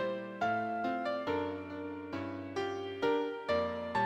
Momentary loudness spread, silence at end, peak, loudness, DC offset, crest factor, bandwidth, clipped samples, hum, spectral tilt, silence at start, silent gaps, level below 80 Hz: 8 LU; 0 s; -20 dBFS; -36 LUFS; under 0.1%; 16 dB; 15 kHz; under 0.1%; none; -6 dB/octave; 0 s; none; -68 dBFS